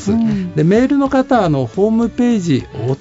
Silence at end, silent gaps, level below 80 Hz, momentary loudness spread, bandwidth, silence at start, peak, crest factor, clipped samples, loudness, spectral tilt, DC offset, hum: 0 s; none; -42 dBFS; 5 LU; 8 kHz; 0 s; -2 dBFS; 12 dB; under 0.1%; -15 LUFS; -7.5 dB/octave; under 0.1%; none